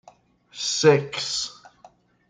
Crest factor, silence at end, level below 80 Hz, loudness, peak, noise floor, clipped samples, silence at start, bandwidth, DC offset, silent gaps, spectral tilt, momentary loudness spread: 22 dB; 0.75 s; -66 dBFS; -22 LUFS; -4 dBFS; -55 dBFS; under 0.1%; 0.55 s; 9.6 kHz; under 0.1%; none; -3.5 dB/octave; 14 LU